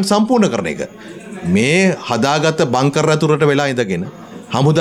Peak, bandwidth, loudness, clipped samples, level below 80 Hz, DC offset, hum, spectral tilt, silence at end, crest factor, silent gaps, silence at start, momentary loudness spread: -2 dBFS; 14 kHz; -15 LUFS; under 0.1%; -52 dBFS; under 0.1%; none; -5.5 dB/octave; 0 s; 12 dB; none; 0 s; 14 LU